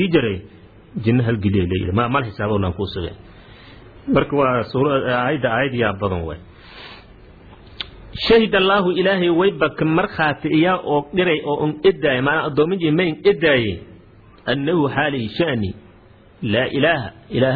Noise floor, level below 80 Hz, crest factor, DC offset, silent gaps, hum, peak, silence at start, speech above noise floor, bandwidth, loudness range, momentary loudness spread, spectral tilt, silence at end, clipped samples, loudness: -47 dBFS; -44 dBFS; 16 dB; under 0.1%; none; none; -2 dBFS; 0 s; 29 dB; 4.9 kHz; 4 LU; 15 LU; -9 dB/octave; 0 s; under 0.1%; -19 LUFS